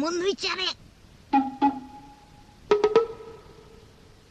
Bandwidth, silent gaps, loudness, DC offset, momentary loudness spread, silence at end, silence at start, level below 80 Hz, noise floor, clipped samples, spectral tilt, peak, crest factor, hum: 9.2 kHz; none; -25 LUFS; under 0.1%; 22 LU; 0.8 s; 0 s; -58 dBFS; -52 dBFS; under 0.1%; -3.5 dB/octave; -6 dBFS; 22 dB; none